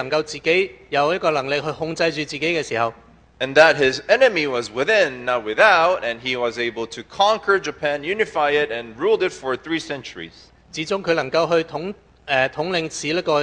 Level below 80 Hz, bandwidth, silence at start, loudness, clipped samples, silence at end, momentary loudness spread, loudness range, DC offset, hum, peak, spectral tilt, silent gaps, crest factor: -56 dBFS; 9.8 kHz; 0 s; -20 LUFS; under 0.1%; 0 s; 13 LU; 6 LU; under 0.1%; none; 0 dBFS; -4 dB/octave; none; 20 dB